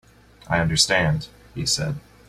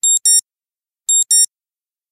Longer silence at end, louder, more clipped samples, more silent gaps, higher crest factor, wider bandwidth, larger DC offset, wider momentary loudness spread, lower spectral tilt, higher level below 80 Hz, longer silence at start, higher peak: second, 0.3 s vs 0.65 s; second, -21 LUFS vs -12 LUFS; neither; neither; first, 20 dB vs 14 dB; second, 15 kHz vs 17.5 kHz; neither; first, 11 LU vs 7 LU; first, -3.5 dB/octave vs 7 dB/octave; first, -44 dBFS vs -86 dBFS; first, 0.45 s vs 0.05 s; about the same, -4 dBFS vs -4 dBFS